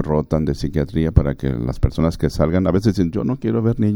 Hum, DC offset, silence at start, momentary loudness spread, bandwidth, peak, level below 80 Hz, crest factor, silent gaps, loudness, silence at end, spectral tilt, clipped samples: none; under 0.1%; 0 s; 4 LU; 17 kHz; 0 dBFS; -28 dBFS; 18 dB; none; -19 LUFS; 0 s; -8.5 dB/octave; under 0.1%